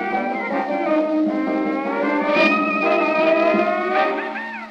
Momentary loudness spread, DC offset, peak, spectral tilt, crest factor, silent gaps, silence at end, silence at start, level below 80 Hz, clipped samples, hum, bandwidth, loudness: 6 LU; under 0.1%; -6 dBFS; -6.5 dB/octave; 14 dB; none; 0 s; 0 s; -68 dBFS; under 0.1%; none; 7.6 kHz; -19 LUFS